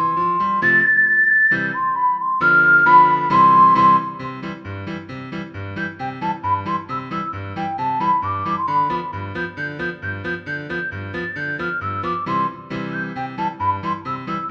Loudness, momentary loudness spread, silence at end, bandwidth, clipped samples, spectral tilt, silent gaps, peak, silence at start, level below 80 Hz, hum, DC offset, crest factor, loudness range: -18 LUFS; 17 LU; 0 s; 6.6 kHz; under 0.1%; -7 dB/octave; none; -2 dBFS; 0 s; -54 dBFS; none; under 0.1%; 16 dB; 12 LU